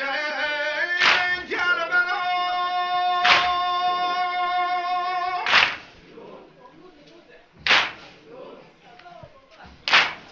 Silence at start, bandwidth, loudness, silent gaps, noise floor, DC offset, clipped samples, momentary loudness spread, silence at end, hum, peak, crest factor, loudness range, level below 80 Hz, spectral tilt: 0 s; 7.8 kHz; -21 LUFS; none; -50 dBFS; under 0.1%; under 0.1%; 8 LU; 0 s; none; -2 dBFS; 22 dB; 7 LU; -60 dBFS; -1 dB/octave